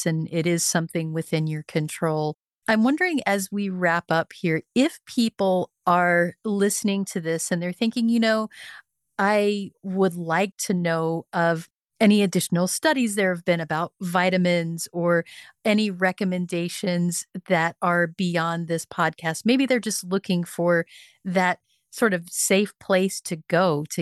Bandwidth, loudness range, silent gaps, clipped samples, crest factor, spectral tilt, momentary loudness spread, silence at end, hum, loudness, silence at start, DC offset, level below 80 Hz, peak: 12.5 kHz; 2 LU; none; under 0.1%; 16 dB; -4.5 dB/octave; 7 LU; 0 s; none; -23 LUFS; 0 s; under 0.1%; -72 dBFS; -8 dBFS